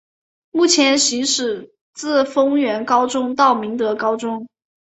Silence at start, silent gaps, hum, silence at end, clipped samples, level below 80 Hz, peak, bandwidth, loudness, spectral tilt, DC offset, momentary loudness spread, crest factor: 0.55 s; 1.81-1.93 s; none; 0.4 s; under 0.1%; -66 dBFS; -2 dBFS; 8.4 kHz; -17 LUFS; -1.5 dB/octave; under 0.1%; 12 LU; 16 dB